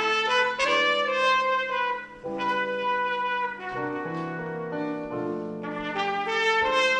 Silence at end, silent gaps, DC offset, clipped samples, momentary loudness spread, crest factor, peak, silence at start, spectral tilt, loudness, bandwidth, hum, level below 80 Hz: 0 s; none; under 0.1%; under 0.1%; 10 LU; 16 dB; -10 dBFS; 0 s; -3.5 dB/octave; -26 LUFS; 10.5 kHz; 50 Hz at -65 dBFS; -62 dBFS